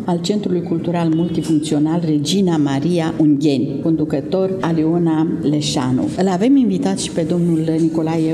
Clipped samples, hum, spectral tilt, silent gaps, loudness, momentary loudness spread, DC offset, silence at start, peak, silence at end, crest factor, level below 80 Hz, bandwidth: under 0.1%; none; -6.5 dB/octave; none; -17 LUFS; 4 LU; under 0.1%; 0 s; -4 dBFS; 0 s; 12 dB; -50 dBFS; 12.5 kHz